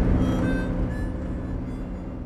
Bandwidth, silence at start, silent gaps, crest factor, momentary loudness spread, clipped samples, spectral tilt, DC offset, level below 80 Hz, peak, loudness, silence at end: 10.5 kHz; 0 s; none; 16 dB; 10 LU; under 0.1%; -8.5 dB/octave; under 0.1%; -30 dBFS; -10 dBFS; -28 LUFS; 0 s